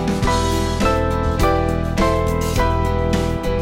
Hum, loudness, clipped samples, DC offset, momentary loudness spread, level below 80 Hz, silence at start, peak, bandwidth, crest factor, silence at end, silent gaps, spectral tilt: none; -19 LUFS; under 0.1%; 0.2%; 2 LU; -24 dBFS; 0 s; -4 dBFS; 16.5 kHz; 14 dB; 0 s; none; -6 dB/octave